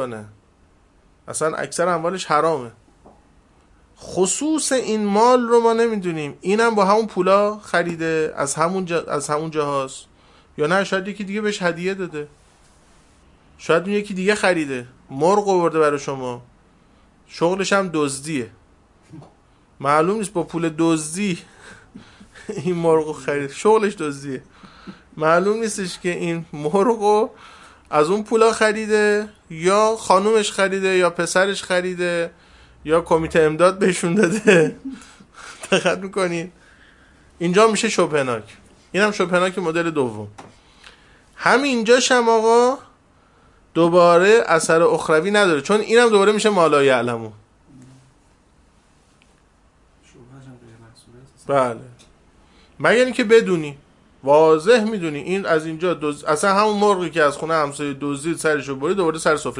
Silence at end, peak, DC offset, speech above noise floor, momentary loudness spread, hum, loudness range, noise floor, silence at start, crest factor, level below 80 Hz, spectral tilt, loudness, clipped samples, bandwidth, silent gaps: 0 s; 0 dBFS; under 0.1%; 38 dB; 13 LU; none; 7 LU; -56 dBFS; 0 s; 20 dB; -56 dBFS; -4.5 dB/octave; -19 LUFS; under 0.1%; 11.5 kHz; none